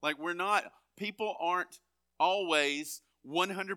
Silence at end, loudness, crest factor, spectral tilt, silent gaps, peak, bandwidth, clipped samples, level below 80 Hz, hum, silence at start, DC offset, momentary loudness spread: 0 s; -32 LUFS; 22 dB; -2.5 dB/octave; none; -12 dBFS; over 20 kHz; under 0.1%; -86 dBFS; none; 0 s; under 0.1%; 14 LU